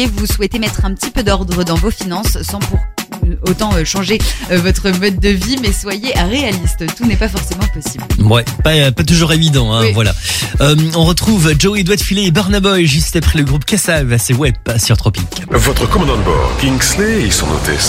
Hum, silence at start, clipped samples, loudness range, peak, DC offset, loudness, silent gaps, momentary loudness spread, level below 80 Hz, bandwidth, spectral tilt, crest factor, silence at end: none; 0 s; under 0.1%; 4 LU; 0 dBFS; under 0.1%; -13 LUFS; none; 7 LU; -20 dBFS; 16.5 kHz; -4.5 dB/octave; 12 dB; 0 s